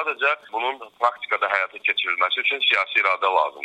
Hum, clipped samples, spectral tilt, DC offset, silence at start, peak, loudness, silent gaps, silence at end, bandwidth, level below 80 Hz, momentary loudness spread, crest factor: none; under 0.1%; -0.5 dB/octave; under 0.1%; 0 s; -4 dBFS; -21 LUFS; none; 0 s; 10.5 kHz; -76 dBFS; 7 LU; 18 dB